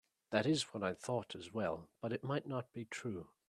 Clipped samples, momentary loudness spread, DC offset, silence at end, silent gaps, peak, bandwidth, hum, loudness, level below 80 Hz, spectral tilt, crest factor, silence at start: under 0.1%; 9 LU; under 0.1%; 0.2 s; none; -18 dBFS; 13 kHz; none; -40 LUFS; -76 dBFS; -5 dB/octave; 22 dB; 0.3 s